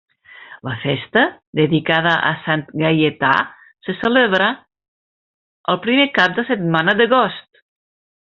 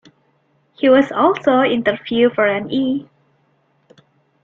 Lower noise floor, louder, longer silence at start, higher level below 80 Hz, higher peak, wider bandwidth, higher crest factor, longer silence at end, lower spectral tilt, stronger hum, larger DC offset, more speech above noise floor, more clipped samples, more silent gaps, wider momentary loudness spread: second, -41 dBFS vs -61 dBFS; about the same, -16 LUFS vs -16 LUFS; second, 0.4 s vs 0.8 s; about the same, -58 dBFS vs -60 dBFS; about the same, 0 dBFS vs -2 dBFS; about the same, 7.2 kHz vs 7 kHz; about the same, 18 dB vs 16 dB; second, 0.85 s vs 1.4 s; second, -3 dB/octave vs -6.5 dB/octave; neither; neither; second, 24 dB vs 46 dB; neither; first, 1.47-1.53 s, 4.88-5.64 s vs none; first, 14 LU vs 6 LU